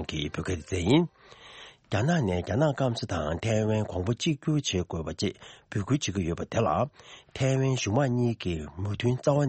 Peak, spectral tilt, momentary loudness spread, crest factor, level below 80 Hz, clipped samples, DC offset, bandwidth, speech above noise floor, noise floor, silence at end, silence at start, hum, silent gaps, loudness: -10 dBFS; -6 dB/octave; 9 LU; 18 dB; -50 dBFS; under 0.1%; under 0.1%; 8.8 kHz; 22 dB; -49 dBFS; 0 s; 0 s; none; none; -28 LUFS